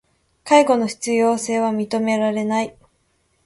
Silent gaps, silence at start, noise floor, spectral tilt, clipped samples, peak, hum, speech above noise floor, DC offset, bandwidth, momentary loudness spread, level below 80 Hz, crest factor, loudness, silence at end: none; 0.45 s; -65 dBFS; -4.5 dB/octave; under 0.1%; 0 dBFS; none; 47 dB; under 0.1%; 11.5 kHz; 8 LU; -64 dBFS; 20 dB; -19 LUFS; 0.75 s